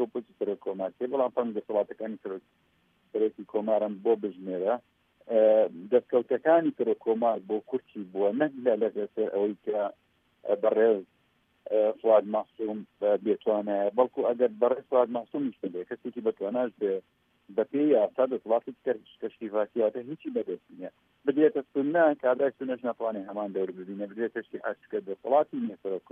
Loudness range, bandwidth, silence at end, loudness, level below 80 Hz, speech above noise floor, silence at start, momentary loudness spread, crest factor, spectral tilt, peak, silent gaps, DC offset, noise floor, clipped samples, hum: 5 LU; 3.7 kHz; 0.15 s; -28 LUFS; -82 dBFS; 41 dB; 0 s; 12 LU; 20 dB; -9 dB/octave; -10 dBFS; none; under 0.1%; -69 dBFS; under 0.1%; none